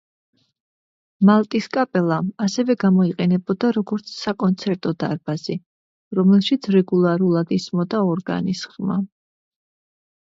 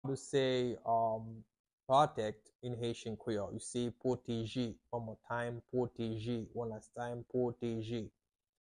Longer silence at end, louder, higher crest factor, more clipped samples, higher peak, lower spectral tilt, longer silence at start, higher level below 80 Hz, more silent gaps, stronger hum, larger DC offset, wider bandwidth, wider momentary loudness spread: first, 1.3 s vs 0.55 s; first, -20 LUFS vs -38 LUFS; about the same, 18 dB vs 22 dB; neither; first, -2 dBFS vs -16 dBFS; about the same, -7 dB/octave vs -6 dB/octave; first, 1.2 s vs 0.05 s; about the same, -64 dBFS vs -68 dBFS; first, 5.66-6.11 s vs 1.60-1.64 s, 1.73-1.78 s, 2.55-2.59 s; neither; neither; second, 7.6 kHz vs 11 kHz; about the same, 10 LU vs 11 LU